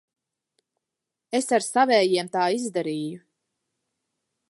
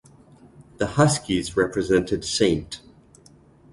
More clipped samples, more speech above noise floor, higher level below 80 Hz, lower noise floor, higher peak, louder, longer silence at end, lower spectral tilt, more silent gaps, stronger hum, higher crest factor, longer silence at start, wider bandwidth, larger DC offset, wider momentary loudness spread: neither; first, 63 dB vs 31 dB; second, -84 dBFS vs -46 dBFS; first, -86 dBFS vs -52 dBFS; about the same, -6 dBFS vs -4 dBFS; about the same, -23 LUFS vs -22 LUFS; first, 1.3 s vs 0.95 s; second, -3.5 dB/octave vs -5 dB/octave; neither; neither; about the same, 20 dB vs 20 dB; first, 1.3 s vs 0.6 s; about the same, 11.5 kHz vs 11.5 kHz; neither; about the same, 11 LU vs 10 LU